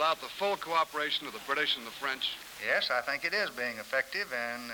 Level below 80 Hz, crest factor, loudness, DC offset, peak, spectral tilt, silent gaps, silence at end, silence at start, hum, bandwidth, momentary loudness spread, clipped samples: -70 dBFS; 18 dB; -31 LUFS; under 0.1%; -16 dBFS; -1.5 dB/octave; none; 0 s; 0 s; none; over 20 kHz; 5 LU; under 0.1%